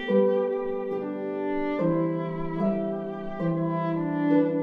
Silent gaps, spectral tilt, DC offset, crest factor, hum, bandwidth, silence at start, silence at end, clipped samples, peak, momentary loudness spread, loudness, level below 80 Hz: none; -10 dB/octave; under 0.1%; 16 dB; none; 4.9 kHz; 0 s; 0 s; under 0.1%; -10 dBFS; 8 LU; -27 LUFS; -52 dBFS